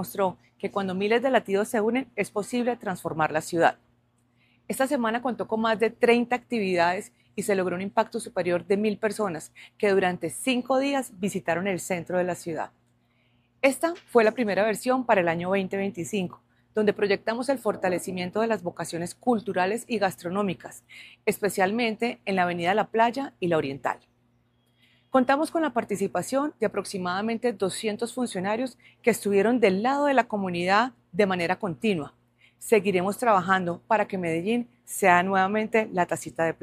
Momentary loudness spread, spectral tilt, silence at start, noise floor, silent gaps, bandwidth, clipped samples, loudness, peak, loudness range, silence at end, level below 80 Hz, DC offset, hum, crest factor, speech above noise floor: 9 LU; -5 dB/octave; 0 s; -66 dBFS; none; 15.5 kHz; under 0.1%; -26 LUFS; -4 dBFS; 4 LU; 0.1 s; -66 dBFS; under 0.1%; none; 22 dB; 41 dB